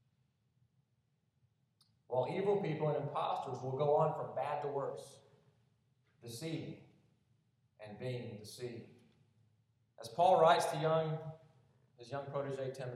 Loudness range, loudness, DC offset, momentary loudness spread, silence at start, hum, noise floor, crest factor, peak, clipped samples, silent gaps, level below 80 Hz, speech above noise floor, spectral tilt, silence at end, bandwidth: 14 LU; -36 LUFS; under 0.1%; 21 LU; 2.1 s; none; -79 dBFS; 22 dB; -16 dBFS; under 0.1%; none; -84 dBFS; 43 dB; -6 dB/octave; 0 s; 14.5 kHz